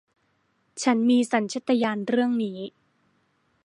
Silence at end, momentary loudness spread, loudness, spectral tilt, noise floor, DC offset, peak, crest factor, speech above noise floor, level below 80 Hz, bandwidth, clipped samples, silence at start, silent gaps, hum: 1 s; 16 LU; -24 LUFS; -4.5 dB/octave; -69 dBFS; under 0.1%; -8 dBFS; 18 dB; 46 dB; -78 dBFS; 11 kHz; under 0.1%; 0.75 s; none; none